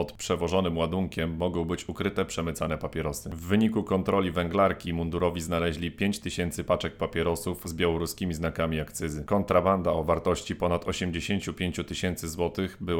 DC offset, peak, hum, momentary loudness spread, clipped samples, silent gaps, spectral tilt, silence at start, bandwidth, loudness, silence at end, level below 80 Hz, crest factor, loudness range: under 0.1%; -10 dBFS; none; 6 LU; under 0.1%; none; -5.5 dB/octave; 0 s; 18.5 kHz; -28 LUFS; 0 s; -46 dBFS; 18 dB; 2 LU